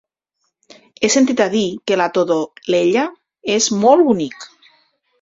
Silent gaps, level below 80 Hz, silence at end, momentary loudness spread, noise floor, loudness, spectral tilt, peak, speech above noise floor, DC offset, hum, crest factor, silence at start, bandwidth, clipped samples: none; -60 dBFS; 0.75 s; 10 LU; -72 dBFS; -16 LUFS; -3.5 dB/octave; -2 dBFS; 56 dB; under 0.1%; none; 16 dB; 1 s; 7.8 kHz; under 0.1%